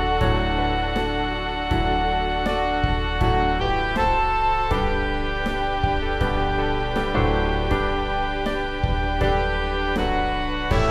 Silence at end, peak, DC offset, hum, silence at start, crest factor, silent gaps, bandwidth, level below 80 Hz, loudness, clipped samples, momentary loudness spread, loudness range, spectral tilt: 0 s; -8 dBFS; under 0.1%; none; 0 s; 14 dB; none; 11.5 kHz; -26 dBFS; -23 LUFS; under 0.1%; 4 LU; 1 LU; -6.5 dB/octave